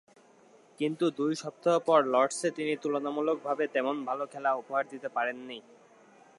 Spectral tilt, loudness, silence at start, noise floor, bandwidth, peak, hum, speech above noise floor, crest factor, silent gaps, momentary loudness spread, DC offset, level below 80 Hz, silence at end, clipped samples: -4.5 dB/octave; -30 LUFS; 0.8 s; -59 dBFS; 11.5 kHz; -10 dBFS; none; 30 dB; 20 dB; none; 10 LU; under 0.1%; -88 dBFS; 0.8 s; under 0.1%